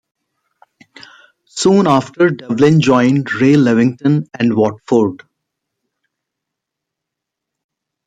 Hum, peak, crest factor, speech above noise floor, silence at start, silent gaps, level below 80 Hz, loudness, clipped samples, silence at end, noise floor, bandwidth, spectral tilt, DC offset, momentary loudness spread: none; -2 dBFS; 14 dB; 68 dB; 1.55 s; none; -58 dBFS; -13 LUFS; under 0.1%; 2.9 s; -80 dBFS; 9.2 kHz; -6.5 dB/octave; under 0.1%; 6 LU